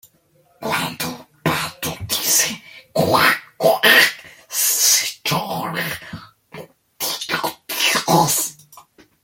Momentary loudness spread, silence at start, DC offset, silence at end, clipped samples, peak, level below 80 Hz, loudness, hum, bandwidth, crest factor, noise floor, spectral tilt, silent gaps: 14 LU; 0.6 s; under 0.1%; 0.45 s; under 0.1%; 0 dBFS; -56 dBFS; -17 LUFS; none; 17 kHz; 20 dB; -58 dBFS; -1.5 dB/octave; none